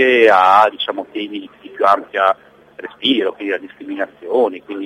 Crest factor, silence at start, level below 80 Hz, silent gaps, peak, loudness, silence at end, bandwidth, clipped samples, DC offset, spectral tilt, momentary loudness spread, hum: 16 dB; 0 s; -68 dBFS; none; 0 dBFS; -16 LUFS; 0 s; 12 kHz; under 0.1%; under 0.1%; -4 dB/octave; 19 LU; none